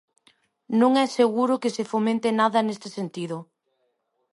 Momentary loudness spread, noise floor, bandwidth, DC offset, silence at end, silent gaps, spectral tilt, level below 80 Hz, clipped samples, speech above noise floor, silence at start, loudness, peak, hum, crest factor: 13 LU; -73 dBFS; 11.5 kHz; under 0.1%; 0.9 s; none; -5.5 dB/octave; -76 dBFS; under 0.1%; 50 dB; 0.7 s; -23 LUFS; -8 dBFS; none; 16 dB